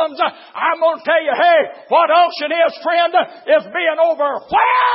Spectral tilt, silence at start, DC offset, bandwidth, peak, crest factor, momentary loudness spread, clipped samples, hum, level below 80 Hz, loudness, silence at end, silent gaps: -7 dB/octave; 0 s; under 0.1%; 5.8 kHz; -2 dBFS; 14 dB; 6 LU; under 0.1%; none; -62 dBFS; -15 LUFS; 0 s; none